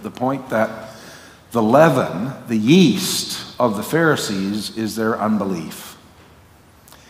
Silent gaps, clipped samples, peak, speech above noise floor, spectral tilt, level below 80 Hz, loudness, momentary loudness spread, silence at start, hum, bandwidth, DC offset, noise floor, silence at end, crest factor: none; under 0.1%; 0 dBFS; 30 dB; -5 dB/octave; -58 dBFS; -18 LUFS; 20 LU; 0 s; none; 16 kHz; under 0.1%; -48 dBFS; 1.15 s; 20 dB